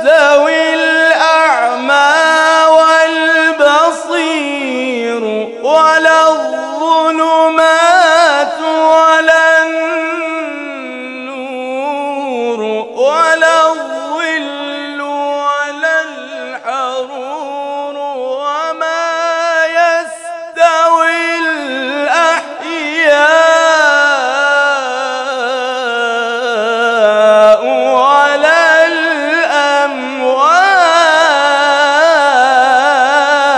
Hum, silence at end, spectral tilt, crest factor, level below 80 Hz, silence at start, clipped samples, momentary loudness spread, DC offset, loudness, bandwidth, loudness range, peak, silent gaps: none; 0 s; -1 dB/octave; 10 dB; -64 dBFS; 0 s; 0.4%; 13 LU; under 0.1%; -10 LUFS; 12 kHz; 8 LU; 0 dBFS; none